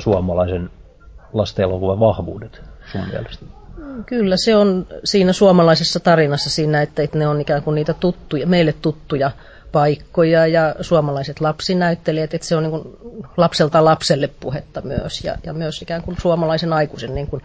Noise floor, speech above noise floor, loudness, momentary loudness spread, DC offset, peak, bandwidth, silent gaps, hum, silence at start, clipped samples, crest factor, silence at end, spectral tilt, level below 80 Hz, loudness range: -42 dBFS; 25 dB; -17 LUFS; 14 LU; under 0.1%; -2 dBFS; 8 kHz; none; none; 0 s; under 0.1%; 16 dB; 0.05 s; -6 dB/octave; -38 dBFS; 6 LU